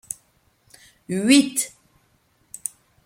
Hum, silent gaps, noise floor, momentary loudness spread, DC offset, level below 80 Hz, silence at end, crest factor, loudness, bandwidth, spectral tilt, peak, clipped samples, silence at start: none; none; -63 dBFS; 19 LU; under 0.1%; -66 dBFS; 1.4 s; 24 dB; -21 LUFS; 16.5 kHz; -3 dB/octave; -2 dBFS; under 0.1%; 1.1 s